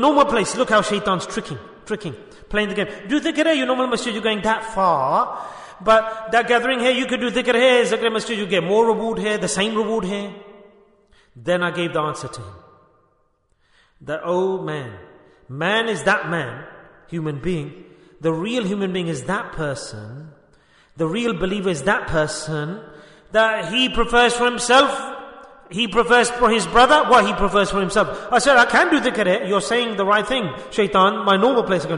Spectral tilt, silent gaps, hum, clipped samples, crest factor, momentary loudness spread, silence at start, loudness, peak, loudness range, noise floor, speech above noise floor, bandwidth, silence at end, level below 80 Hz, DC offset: -4 dB/octave; none; none; under 0.1%; 18 dB; 16 LU; 0 s; -19 LUFS; -2 dBFS; 10 LU; -63 dBFS; 44 dB; 11 kHz; 0 s; -44 dBFS; under 0.1%